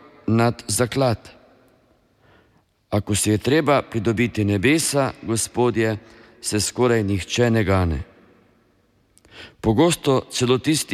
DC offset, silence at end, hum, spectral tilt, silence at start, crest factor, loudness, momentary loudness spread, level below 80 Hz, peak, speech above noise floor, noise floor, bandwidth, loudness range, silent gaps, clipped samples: under 0.1%; 0 s; none; -5 dB/octave; 0.25 s; 18 dB; -20 LUFS; 8 LU; -44 dBFS; -4 dBFS; 41 dB; -61 dBFS; 15.5 kHz; 3 LU; none; under 0.1%